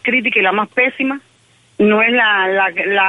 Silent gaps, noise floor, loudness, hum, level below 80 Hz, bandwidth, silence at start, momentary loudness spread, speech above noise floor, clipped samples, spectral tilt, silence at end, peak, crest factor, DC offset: none; -53 dBFS; -14 LUFS; none; -62 dBFS; 9.4 kHz; 0.05 s; 8 LU; 38 dB; under 0.1%; -6 dB/octave; 0 s; -2 dBFS; 14 dB; under 0.1%